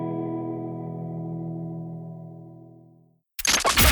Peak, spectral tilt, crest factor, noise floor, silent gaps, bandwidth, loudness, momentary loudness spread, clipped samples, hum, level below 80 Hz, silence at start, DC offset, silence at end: -6 dBFS; -3 dB/octave; 22 dB; -58 dBFS; none; 19.5 kHz; -26 LUFS; 21 LU; under 0.1%; none; -38 dBFS; 0 s; under 0.1%; 0 s